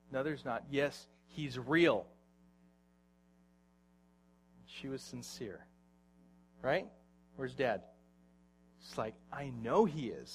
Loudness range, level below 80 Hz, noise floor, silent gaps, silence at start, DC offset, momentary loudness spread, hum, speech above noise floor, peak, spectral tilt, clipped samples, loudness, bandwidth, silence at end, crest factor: 13 LU; -70 dBFS; -69 dBFS; none; 0.1 s; under 0.1%; 21 LU; none; 33 dB; -16 dBFS; -5.5 dB/octave; under 0.1%; -37 LUFS; 14.5 kHz; 0 s; 24 dB